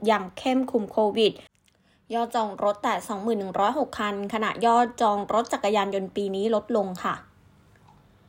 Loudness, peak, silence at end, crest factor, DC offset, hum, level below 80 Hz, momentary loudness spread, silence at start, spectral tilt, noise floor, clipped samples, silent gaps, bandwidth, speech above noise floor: -25 LUFS; -8 dBFS; 1.05 s; 18 dB; under 0.1%; none; -64 dBFS; 7 LU; 0 s; -5 dB/octave; -63 dBFS; under 0.1%; none; 16 kHz; 39 dB